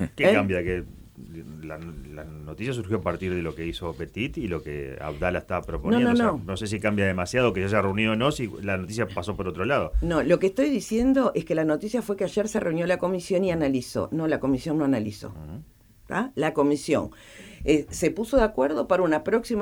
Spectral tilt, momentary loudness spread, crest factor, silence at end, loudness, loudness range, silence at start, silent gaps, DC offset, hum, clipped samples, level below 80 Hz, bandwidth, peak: -6 dB/octave; 16 LU; 18 dB; 0 s; -25 LUFS; 7 LU; 0 s; none; under 0.1%; none; under 0.1%; -42 dBFS; 19.5 kHz; -6 dBFS